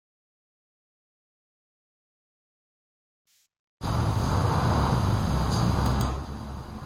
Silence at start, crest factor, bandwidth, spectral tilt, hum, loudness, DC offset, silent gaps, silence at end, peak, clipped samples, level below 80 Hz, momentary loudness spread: 3.8 s; 18 dB; 16.5 kHz; -6.5 dB/octave; none; -26 LUFS; under 0.1%; none; 0 s; -12 dBFS; under 0.1%; -36 dBFS; 12 LU